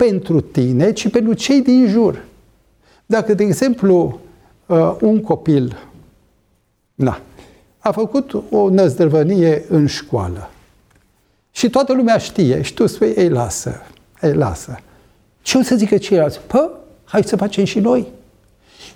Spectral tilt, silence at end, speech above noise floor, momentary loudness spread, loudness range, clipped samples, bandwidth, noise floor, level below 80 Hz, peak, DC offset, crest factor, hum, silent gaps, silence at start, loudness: -6.5 dB/octave; 0.05 s; 47 dB; 11 LU; 3 LU; under 0.1%; 16.5 kHz; -61 dBFS; -46 dBFS; -2 dBFS; under 0.1%; 16 dB; none; none; 0 s; -16 LUFS